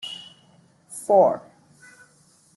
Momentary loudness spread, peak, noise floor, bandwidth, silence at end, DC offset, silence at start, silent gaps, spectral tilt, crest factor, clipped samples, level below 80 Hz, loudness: 21 LU; -6 dBFS; -58 dBFS; 12.5 kHz; 1.2 s; under 0.1%; 0.05 s; none; -4.5 dB/octave; 20 dB; under 0.1%; -74 dBFS; -20 LUFS